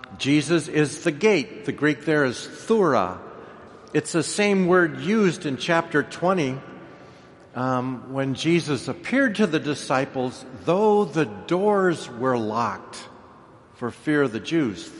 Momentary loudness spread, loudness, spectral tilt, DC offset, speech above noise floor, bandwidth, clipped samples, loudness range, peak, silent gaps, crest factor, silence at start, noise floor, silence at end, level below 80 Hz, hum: 13 LU; -23 LUFS; -5.5 dB/octave; under 0.1%; 26 dB; 11.5 kHz; under 0.1%; 3 LU; -6 dBFS; none; 18 dB; 0.05 s; -49 dBFS; 0 s; -64 dBFS; none